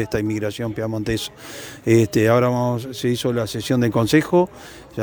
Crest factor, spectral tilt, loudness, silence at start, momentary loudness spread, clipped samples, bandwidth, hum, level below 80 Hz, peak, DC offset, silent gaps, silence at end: 18 dB; -6 dB/octave; -20 LUFS; 0 s; 13 LU; under 0.1%; over 20 kHz; none; -48 dBFS; -2 dBFS; under 0.1%; none; 0 s